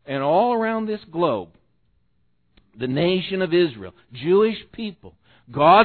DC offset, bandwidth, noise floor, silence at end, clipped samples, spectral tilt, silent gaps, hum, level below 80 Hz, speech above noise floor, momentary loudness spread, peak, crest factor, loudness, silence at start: under 0.1%; 4.5 kHz; -69 dBFS; 0 s; under 0.1%; -9.5 dB/octave; none; none; -58 dBFS; 48 dB; 15 LU; -2 dBFS; 20 dB; -21 LUFS; 0.1 s